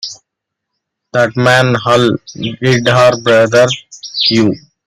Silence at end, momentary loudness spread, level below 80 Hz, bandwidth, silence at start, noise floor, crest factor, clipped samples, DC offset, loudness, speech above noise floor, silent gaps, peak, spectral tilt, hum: 0.3 s; 11 LU; -50 dBFS; 14 kHz; 0 s; -77 dBFS; 12 dB; under 0.1%; under 0.1%; -11 LUFS; 66 dB; none; 0 dBFS; -5 dB/octave; none